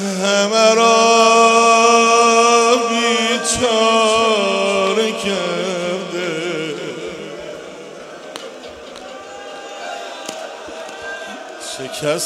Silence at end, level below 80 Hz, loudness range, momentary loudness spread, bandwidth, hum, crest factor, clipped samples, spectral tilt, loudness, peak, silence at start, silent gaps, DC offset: 0 s; -56 dBFS; 19 LU; 22 LU; 14 kHz; none; 16 dB; under 0.1%; -2.5 dB/octave; -14 LUFS; 0 dBFS; 0 s; none; under 0.1%